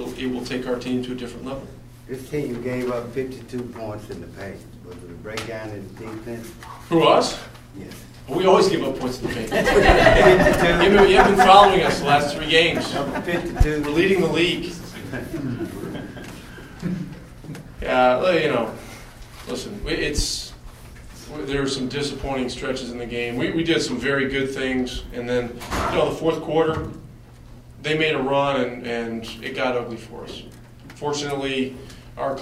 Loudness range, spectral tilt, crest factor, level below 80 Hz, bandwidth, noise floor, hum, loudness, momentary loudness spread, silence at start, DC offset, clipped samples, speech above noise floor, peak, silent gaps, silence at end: 15 LU; -5 dB/octave; 22 dB; -36 dBFS; 16 kHz; -43 dBFS; none; -20 LUFS; 22 LU; 0 s; under 0.1%; under 0.1%; 23 dB; 0 dBFS; none; 0 s